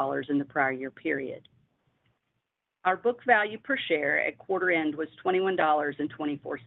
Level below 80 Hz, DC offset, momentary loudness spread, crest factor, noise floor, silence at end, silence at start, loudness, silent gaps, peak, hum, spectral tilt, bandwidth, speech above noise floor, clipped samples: -74 dBFS; under 0.1%; 9 LU; 22 dB; -82 dBFS; 0.05 s; 0 s; -28 LUFS; none; -8 dBFS; none; -8 dB/octave; 4.1 kHz; 54 dB; under 0.1%